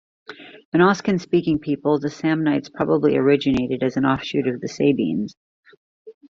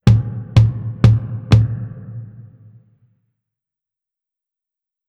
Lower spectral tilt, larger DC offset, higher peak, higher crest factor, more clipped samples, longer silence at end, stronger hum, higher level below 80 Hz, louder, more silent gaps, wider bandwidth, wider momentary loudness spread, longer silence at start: about the same, -7 dB/octave vs -8 dB/octave; neither; about the same, -2 dBFS vs 0 dBFS; about the same, 18 dB vs 18 dB; neither; second, 0.2 s vs 2.7 s; neither; second, -54 dBFS vs -32 dBFS; second, -20 LUFS vs -16 LUFS; first, 0.65-0.72 s, 5.37-5.63 s, 5.77-6.05 s vs none; first, 7.4 kHz vs 6.6 kHz; second, 8 LU vs 19 LU; first, 0.3 s vs 0.05 s